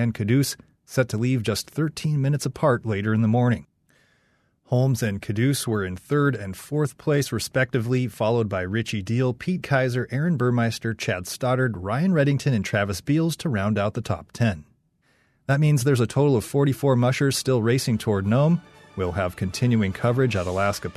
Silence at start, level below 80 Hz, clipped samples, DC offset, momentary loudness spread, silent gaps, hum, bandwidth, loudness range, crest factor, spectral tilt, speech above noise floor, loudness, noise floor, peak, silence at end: 0 s; -56 dBFS; under 0.1%; under 0.1%; 6 LU; none; none; 14 kHz; 3 LU; 16 dB; -6 dB/octave; 43 dB; -23 LUFS; -66 dBFS; -8 dBFS; 0.05 s